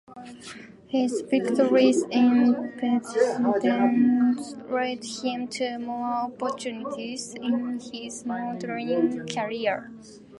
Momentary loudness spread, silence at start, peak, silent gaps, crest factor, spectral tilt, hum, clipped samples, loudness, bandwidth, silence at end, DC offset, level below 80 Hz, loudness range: 13 LU; 0.1 s; -8 dBFS; none; 18 dB; -4.5 dB/octave; none; under 0.1%; -25 LUFS; 11.5 kHz; 0 s; under 0.1%; -70 dBFS; 8 LU